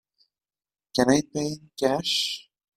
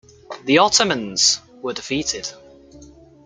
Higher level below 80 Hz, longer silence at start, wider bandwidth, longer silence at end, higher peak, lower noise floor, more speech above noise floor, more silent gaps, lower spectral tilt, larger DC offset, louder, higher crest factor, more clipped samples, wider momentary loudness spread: second, -60 dBFS vs -54 dBFS; first, 0.95 s vs 0.3 s; first, 15.5 kHz vs 12 kHz; about the same, 0.35 s vs 0.4 s; second, -6 dBFS vs -2 dBFS; first, under -90 dBFS vs -45 dBFS; first, over 65 dB vs 26 dB; neither; first, -4 dB/octave vs -2 dB/octave; neither; second, -25 LUFS vs -18 LUFS; about the same, 22 dB vs 20 dB; neither; second, 9 LU vs 17 LU